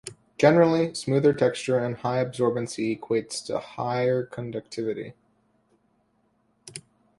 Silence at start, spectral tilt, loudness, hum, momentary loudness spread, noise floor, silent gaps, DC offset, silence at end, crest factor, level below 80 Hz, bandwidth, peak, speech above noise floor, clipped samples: 0.05 s; -6 dB/octave; -25 LUFS; none; 19 LU; -68 dBFS; none; under 0.1%; 0.4 s; 22 dB; -64 dBFS; 11.5 kHz; -4 dBFS; 44 dB; under 0.1%